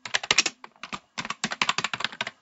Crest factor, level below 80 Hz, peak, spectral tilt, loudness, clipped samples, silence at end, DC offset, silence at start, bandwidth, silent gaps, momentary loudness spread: 28 dB; -66 dBFS; -2 dBFS; -0.5 dB/octave; -26 LUFS; under 0.1%; 0.1 s; under 0.1%; 0.05 s; 8.6 kHz; none; 16 LU